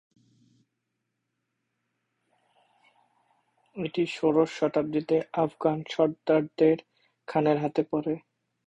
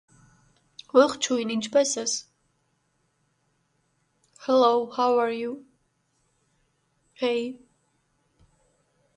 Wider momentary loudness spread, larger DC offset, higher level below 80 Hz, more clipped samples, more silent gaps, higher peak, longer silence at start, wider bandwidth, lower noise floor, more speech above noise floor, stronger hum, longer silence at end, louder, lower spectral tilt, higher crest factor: second, 9 LU vs 13 LU; neither; about the same, -70 dBFS vs -72 dBFS; neither; neither; second, -10 dBFS vs -6 dBFS; first, 3.75 s vs 0.95 s; second, 8.4 kHz vs 11.5 kHz; first, -81 dBFS vs -71 dBFS; first, 55 dB vs 48 dB; neither; second, 0.5 s vs 1.6 s; second, -27 LUFS vs -24 LUFS; first, -7 dB/octave vs -2.5 dB/octave; about the same, 20 dB vs 22 dB